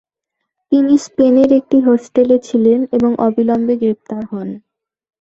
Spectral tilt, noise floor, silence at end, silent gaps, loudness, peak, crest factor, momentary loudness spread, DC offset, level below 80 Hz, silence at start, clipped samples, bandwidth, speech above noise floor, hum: -7 dB/octave; -77 dBFS; 0.65 s; none; -13 LUFS; -2 dBFS; 12 dB; 13 LU; under 0.1%; -54 dBFS; 0.7 s; under 0.1%; 8 kHz; 64 dB; none